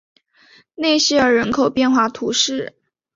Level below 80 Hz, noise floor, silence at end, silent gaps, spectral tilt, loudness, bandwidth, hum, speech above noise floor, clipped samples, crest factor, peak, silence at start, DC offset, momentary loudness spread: -54 dBFS; -52 dBFS; 0.45 s; none; -2.5 dB/octave; -17 LUFS; 7.8 kHz; none; 35 dB; under 0.1%; 14 dB; -4 dBFS; 0.8 s; under 0.1%; 8 LU